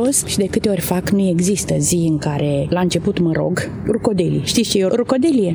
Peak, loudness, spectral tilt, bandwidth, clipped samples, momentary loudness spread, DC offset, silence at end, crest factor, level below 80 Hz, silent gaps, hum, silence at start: -2 dBFS; -17 LUFS; -5 dB/octave; over 20 kHz; under 0.1%; 3 LU; under 0.1%; 0 s; 14 dB; -42 dBFS; none; none; 0 s